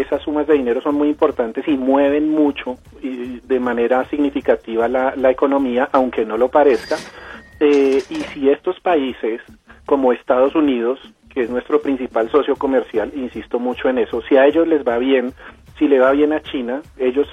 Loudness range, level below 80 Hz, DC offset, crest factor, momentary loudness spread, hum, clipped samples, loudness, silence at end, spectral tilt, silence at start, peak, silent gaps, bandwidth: 2 LU; -48 dBFS; under 0.1%; 16 dB; 12 LU; none; under 0.1%; -17 LUFS; 0 s; -6 dB/octave; 0 s; -2 dBFS; none; 10.5 kHz